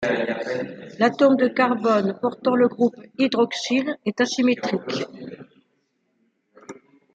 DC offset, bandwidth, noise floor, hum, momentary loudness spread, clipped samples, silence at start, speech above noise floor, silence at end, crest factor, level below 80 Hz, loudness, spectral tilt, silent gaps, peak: under 0.1%; 8.6 kHz; -70 dBFS; none; 11 LU; under 0.1%; 0 s; 49 dB; 0.4 s; 18 dB; -70 dBFS; -22 LUFS; -5 dB/octave; none; -4 dBFS